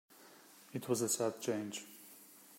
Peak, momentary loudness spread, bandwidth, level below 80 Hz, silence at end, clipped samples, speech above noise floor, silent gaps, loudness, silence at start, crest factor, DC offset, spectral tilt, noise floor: -20 dBFS; 23 LU; 16 kHz; -86 dBFS; 0 s; under 0.1%; 23 dB; none; -38 LUFS; 0.1 s; 20 dB; under 0.1%; -3.5 dB/octave; -60 dBFS